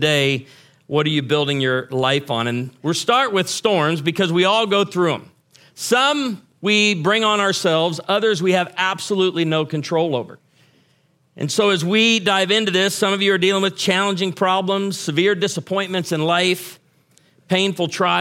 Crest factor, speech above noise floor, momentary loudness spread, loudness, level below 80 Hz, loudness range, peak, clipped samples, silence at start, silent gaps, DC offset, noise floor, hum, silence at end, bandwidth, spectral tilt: 18 dB; 42 dB; 7 LU; -18 LUFS; -68 dBFS; 4 LU; -2 dBFS; under 0.1%; 0 s; none; under 0.1%; -60 dBFS; none; 0 s; 16.5 kHz; -4 dB/octave